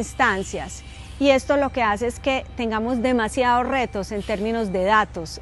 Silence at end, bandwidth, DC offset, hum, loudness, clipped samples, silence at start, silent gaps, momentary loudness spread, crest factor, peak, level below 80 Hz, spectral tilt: 0 s; 12 kHz; under 0.1%; none; -22 LUFS; under 0.1%; 0 s; none; 9 LU; 18 dB; -4 dBFS; -40 dBFS; -4.5 dB/octave